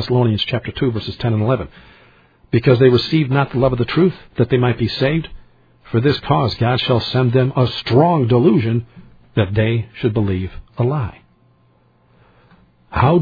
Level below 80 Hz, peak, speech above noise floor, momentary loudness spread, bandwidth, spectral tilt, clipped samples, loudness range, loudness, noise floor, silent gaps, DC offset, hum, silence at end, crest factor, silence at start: -42 dBFS; 0 dBFS; 39 dB; 9 LU; 5 kHz; -9 dB/octave; under 0.1%; 6 LU; -17 LUFS; -55 dBFS; none; under 0.1%; none; 0 s; 18 dB; 0 s